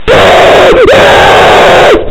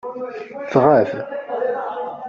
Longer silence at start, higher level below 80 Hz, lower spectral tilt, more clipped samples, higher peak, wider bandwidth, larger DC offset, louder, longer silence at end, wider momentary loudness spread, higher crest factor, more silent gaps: about the same, 0 s vs 0.05 s; first, -22 dBFS vs -60 dBFS; second, -4 dB/octave vs -6.5 dB/octave; first, 20% vs under 0.1%; about the same, 0 dBFS vs -2 dBFS; first, 17 kHz vs 7.2 kHz; neither; first, -2 LUFS vs -19 LUFS; about the same, 0 s vs 0 s; second, 1 LU vs 16 LU; second, 2 dB vs 18 dB; neither